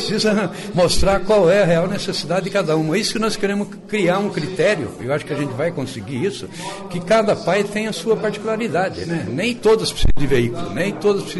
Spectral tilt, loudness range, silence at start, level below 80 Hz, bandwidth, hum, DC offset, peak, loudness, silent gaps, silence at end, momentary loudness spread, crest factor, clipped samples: -5 dB/octave; 4 LU; 0 s; -32 dBFS; 12 kHz; none; under 0.1%; -6 dBFS; -19 LUFS; none; 0 s; 8 LU; 12 dB; under 0.1%